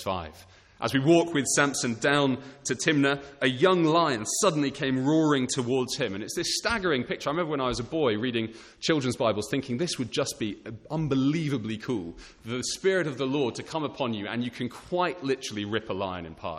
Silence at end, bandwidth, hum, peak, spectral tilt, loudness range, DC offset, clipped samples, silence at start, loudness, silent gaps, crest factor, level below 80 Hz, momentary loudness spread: 0 s; 14 kHz; none; -8 dBFS; -4.5 dB/octave; 5 LU; under 0.1%; under 0.1%; 0 s; -27 LUFS; none; 20 dB; -58 dBFS; 10 LU